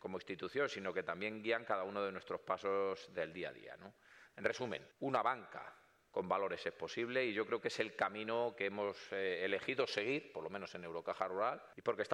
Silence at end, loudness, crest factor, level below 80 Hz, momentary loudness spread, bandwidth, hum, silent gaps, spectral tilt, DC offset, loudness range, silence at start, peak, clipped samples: 0 s; -40 LUFS; 20 dB; -82 dBFS; 9 LU; 11.5 kHz; none; none; -4.5 dB/octave; under 0.1%; 3 LU; 0.05 s; -20 dBFS; under 0.1%